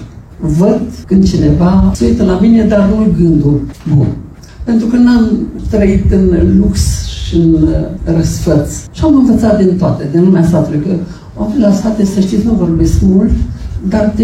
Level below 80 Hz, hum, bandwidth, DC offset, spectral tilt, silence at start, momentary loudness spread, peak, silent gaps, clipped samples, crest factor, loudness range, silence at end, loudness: -22 dBFS; none; 13 kHz; under 0.1%; -7.5 dB/octave; 0 s; 8 LU; 0 dBFS; none; under 0.1%; 10 dB; 2 LU; 0 s; -10 LUFS